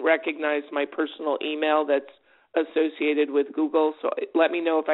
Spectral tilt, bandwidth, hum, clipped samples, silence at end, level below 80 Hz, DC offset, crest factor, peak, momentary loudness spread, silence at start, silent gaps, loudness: 0 dB/octave; 4.1 kHz; none; under 0.1%; 0 s; -78 dBFS; under 0.1%; 18 dB; -8 dBFS; 6 LU; 0 s; none; -25 LUFS